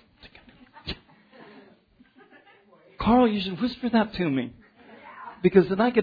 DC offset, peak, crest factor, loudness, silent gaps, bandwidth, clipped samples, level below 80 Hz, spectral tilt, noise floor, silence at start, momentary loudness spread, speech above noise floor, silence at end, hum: under 0.1%; -4 dBFS; 22 dB; -23 LUFS; none; 5 kHz; under 0.1%; -50 dBFS; -9 dB/octave; -58 dBFS; 0.25 s; 20 LU; 36 dB; 0 s; none